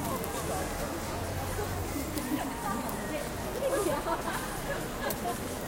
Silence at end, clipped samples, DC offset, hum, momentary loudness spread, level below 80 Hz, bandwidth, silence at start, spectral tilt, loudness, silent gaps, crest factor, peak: 0 s; under 0.1%; under 0.1%; none; 4 LU; -44 dBFS; 17 kHz; 0 s; -4.5 dB/octave; -33 LUFS; none; 18 dB; -16 dBFS